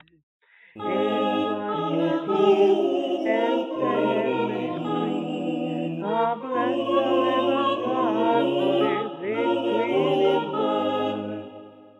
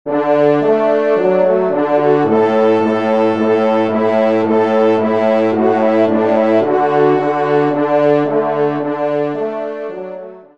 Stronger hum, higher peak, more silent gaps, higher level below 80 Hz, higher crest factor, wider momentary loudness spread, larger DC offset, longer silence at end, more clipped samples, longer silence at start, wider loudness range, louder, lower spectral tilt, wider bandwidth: neither; second, -8 dBFS vs 0 dBFS; neither; second, -80 dBFS vs -62 dBFS; about the same, 16 dB vs 12 dB; about the same, 7 LU vs 6 LU; second, under 0.1% vs 0.5%; about the same, 0.15 s vs 0.15 s; neither; first, 0.75 s vs 0.05 s; about the same, 3 LU vs 2 LU; second, -24 LUFS vs -14 LUFS; about the same, -7 dB/octave vs -8 dB/octave; first, 8.2 kHz vs 7.2 kHz